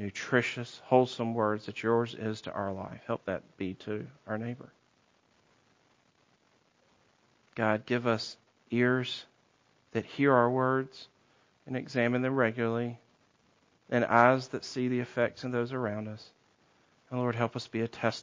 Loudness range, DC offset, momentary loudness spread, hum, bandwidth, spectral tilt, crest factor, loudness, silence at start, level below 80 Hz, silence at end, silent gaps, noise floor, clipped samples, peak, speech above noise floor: 10 LU; under 0.1%; 14 LU; none; 7.6 kHz; -6.5 dB/octave; 26 dB; -31 LUFS; 0 s; -68 dBFS; 0 s; none; -69 dBFS; under 0.1%; -6 dBFS; 39 dB